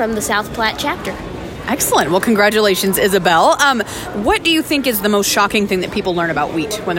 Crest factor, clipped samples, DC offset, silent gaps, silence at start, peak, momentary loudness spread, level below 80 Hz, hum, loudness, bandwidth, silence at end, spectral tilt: 14 dB; under 0.1%; under 0.1%; none; 0 s; 0 dBFS; 9 LU; -40 dBFS; none; -15 LUFS; 16.5 kHz; 0 s; -3 dB/octave